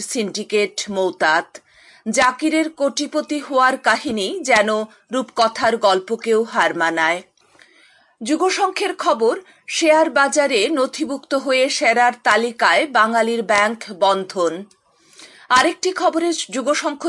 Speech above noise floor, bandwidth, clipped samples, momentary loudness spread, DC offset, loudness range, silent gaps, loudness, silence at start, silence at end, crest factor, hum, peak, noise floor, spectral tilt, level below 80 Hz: 35 dB; 11.5 kHz; under 0.1%; 8 LU; under 0.1%; 3 LU; none; -18 LUFS; 0 s; 0 s; 18 dB; none; -2 dBFS; -53 dBFS; -2.5 dB/octave; -64 dBFS